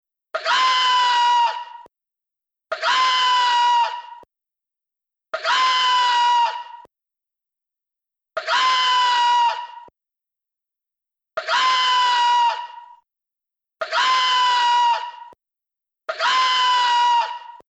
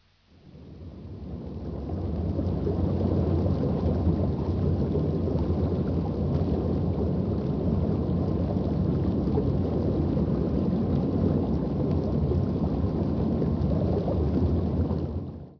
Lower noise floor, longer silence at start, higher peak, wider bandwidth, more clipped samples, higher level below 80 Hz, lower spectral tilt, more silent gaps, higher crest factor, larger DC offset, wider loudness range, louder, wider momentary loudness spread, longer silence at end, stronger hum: first, -87 dBFS vs -55 dBFS; about the same, 0.35 s vs 0.45 s; first, -8 dBFS vs -12 dBFS; first, 8.4 kHz vs 5.4 kHz; neither; second, -80 dBFS vs -36 dBFS; second, 3 dB/octave vs -11 dB/octave; neither; about the same, 14 dB vs 14 dB; neither; about the same, 2 LU vs 2 LU; first, -18 LUFS vs -27 LUFS; first, 16 LU vs 8 LU; about the same, 0.15 s vs 0.05 s; neither